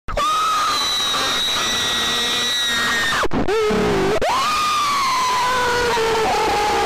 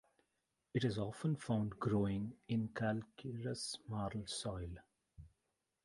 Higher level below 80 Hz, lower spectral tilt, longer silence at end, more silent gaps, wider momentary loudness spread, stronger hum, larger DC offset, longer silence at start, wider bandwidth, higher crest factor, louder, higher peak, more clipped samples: first, -38 dBFS vs -62 dBFS; second, -2 dB/octave vs -6 dB/octave; second, 0 s vs 0.6 s; neither; second, 1 LU vs 8 LU; neither; neither; second, 0.1 s vs 0.75 s; first, 15.5 kHz vs 11.5 kHz; second, 6 dB vs 18 dB; first, -17 LUFS vs -41 LUFS; first, -12 dBFS vs -24 dBFS; neither